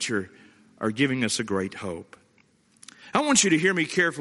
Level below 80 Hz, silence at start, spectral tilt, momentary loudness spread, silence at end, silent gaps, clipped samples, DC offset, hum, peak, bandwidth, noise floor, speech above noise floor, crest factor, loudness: -66 dBFS; 0 s; -3 dB/octave; 16 LU; 0 s; none; under 0.1%; under 0.1%; none; -4 dBFS; 11.5 kHz; -62 dBFS; 38 dB; 22 dB; -24 LUFS